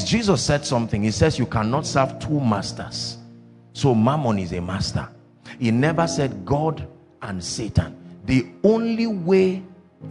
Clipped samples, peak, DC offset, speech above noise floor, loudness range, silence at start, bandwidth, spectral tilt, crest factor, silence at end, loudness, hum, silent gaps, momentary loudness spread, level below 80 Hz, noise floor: under 0.1%; -4 dBFS; under 0.1%; 25 dB; 2 LU; 0 s; 11 kHz; -5.5 dB/octave; 18 dB; 0 s; -22 LUFS; none; none; 15 LU; -46 dBFS; -46 dBFS